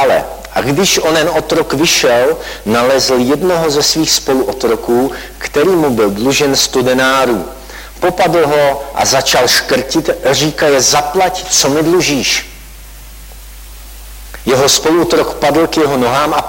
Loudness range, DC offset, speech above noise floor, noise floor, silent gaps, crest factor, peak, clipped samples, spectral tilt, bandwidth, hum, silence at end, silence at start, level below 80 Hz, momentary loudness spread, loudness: 4 LU; under 0.1%; 20 dB; -32 dBFS; none; 12 dB; 0 dBFS; under 0.1%; -3 dB/octave; 16.5 kHz; none; 0 s; 0 s; -36 dBFS; 8 LU; -11 LUFS